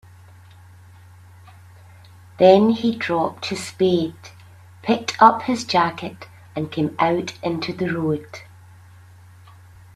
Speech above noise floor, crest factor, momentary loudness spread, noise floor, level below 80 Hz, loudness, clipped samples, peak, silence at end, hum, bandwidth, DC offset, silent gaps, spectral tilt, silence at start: 27 dB; 22 dB; 17 LU; -46 dBFS; -60 dBFS; -20 LUFS; under 0.1%; 0 dBFS; 1.55 s; none; 13.5 kHz; under 0.1%; none; -5.5 dB/octave; 2.4 s